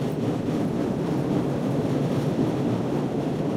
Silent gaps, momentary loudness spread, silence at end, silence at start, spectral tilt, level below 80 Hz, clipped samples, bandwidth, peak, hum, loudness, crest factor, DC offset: none; 2 LU; 0 s; 0 s; -8 dB/octave; -50 dBFS; under 0.1%; 16 kHz; -12 dBFS; none; -25 LUFS; 12 dB; under 0.1%